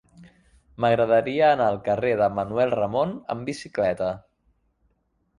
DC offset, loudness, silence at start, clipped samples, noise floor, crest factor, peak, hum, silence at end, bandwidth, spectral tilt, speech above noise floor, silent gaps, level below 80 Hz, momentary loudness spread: under 0.1%; -23 LUFS; 0.2 s; under 0.1%; -70 dBFS; 18 dB; -8 dBFS; none; 1.2 s; 11 kHz; -6.5 dB/octave; 47 dB; none; -56 dBFS; 11 LU